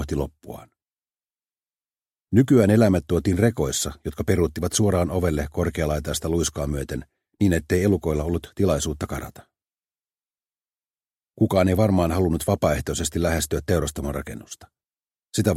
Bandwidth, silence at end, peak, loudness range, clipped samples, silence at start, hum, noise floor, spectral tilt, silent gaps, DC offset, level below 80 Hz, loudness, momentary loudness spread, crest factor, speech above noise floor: 16 kHz; 0 s; -4 dBFS; 5 LU; under 0.1%; 0 s; none; under -90 dBFS; -5.5 dB/octave; 0.93-0.97 s, 10.90-10.94 s; under 0.1%; -38 dBFS; -23 LUFS; 14 LU; 20 dB; over 68 dB